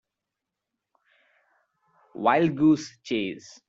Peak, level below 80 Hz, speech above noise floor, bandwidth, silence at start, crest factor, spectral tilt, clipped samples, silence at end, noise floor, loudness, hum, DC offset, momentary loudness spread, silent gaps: -8 dBFS; -66 dBFS; 62 dB; 7.8 kHz; 2.15 s; 20 dB; -6 dB/octave; under 0.1%; 0.3 s; -86 dBFS; -24 LUFS; none; under 0.1%; 12 LU; none